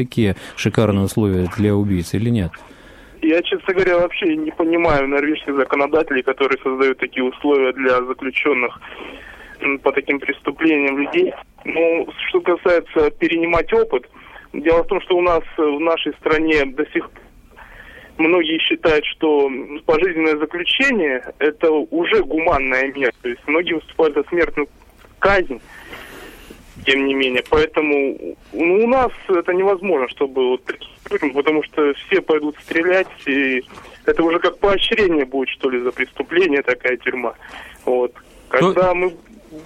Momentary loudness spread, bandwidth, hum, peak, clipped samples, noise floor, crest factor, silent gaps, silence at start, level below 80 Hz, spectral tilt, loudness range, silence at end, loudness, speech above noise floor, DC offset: 9 LU; 14 kHz; none; -2 dBFS; under 0.1%; -43 dBFS; 18 dB; none; 0 s; -40 dBFS; -6 dB/octave; 2 LU; 0 s; -18 LUFS; 25 dB; under 0.1%